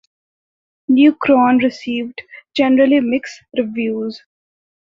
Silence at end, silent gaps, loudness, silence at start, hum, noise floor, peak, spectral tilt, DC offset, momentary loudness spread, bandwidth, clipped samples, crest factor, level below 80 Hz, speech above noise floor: 0.7 s; none; -16 LUFS; 0.9 s; none; under -90 dBFS; -2 dBFS; -5.5 dB/octave; under 0.1%; 14 LU; 7.4 kHz; under 0.1%; 16 dB; -60 dBFS; over 75 dB